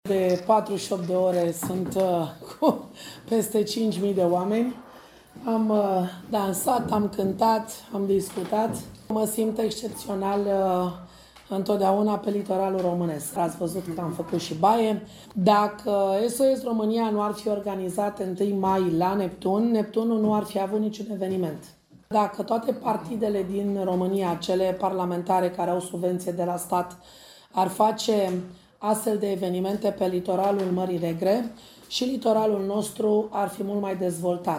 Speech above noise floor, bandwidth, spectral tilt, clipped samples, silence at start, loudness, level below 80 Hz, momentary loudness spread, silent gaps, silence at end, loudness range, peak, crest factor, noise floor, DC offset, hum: 23 dB; 16 kHz; -6 dB/octave; under 0.1%; 0.05 s; -25 LUFS; -60 dBFS; 7 LU; none; 0 s; 2 LU; -6 dBFS; 20 dB; -48 dBFS; under 0.1%; none